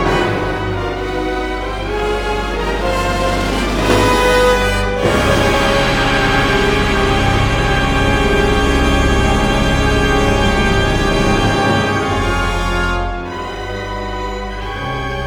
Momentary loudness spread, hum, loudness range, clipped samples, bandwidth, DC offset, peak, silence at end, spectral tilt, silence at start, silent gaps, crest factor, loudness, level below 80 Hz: 9 LU; none; 5 LU; under 0.1%; 19.5 kHz; 0.3%; 0 dBFS; 0 s; -5 dB/octave; 0 s; none; 14 dB; -15 LUFS; -22 dBFS